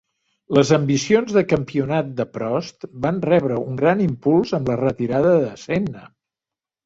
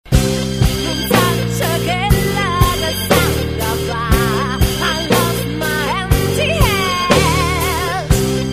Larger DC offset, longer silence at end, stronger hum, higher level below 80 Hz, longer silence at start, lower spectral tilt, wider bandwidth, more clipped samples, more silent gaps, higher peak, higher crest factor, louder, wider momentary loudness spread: neither; first, 0.8 s vs 0 s; neither; second, -52 dBFS vs -24 dBFS; first, 0.5 s vs 0.05 s; first, -6.5 dB/octave vs -4.5 dB/octave; second, 8 kHz vs 15.5 kHz; neither; neither; about the same, -2 dBFS vs 0 dBFS; about the same, 18 dB vs 16 dB; second, -20 LUFS vs -15 LUFS; first, 9 LU vs 5 LU